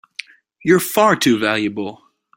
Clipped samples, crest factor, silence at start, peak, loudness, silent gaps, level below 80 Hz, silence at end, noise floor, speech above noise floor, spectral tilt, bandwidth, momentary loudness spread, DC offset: under 0.1%; 18 dB; 0.65 s; 0 dBFS; -16 LUFS; none; -58 dBFS; 0.4 s; -37 dBFS; 21 dB; -4.5 dB/octave; 16.5 kHz; 17 LU; under 0.1%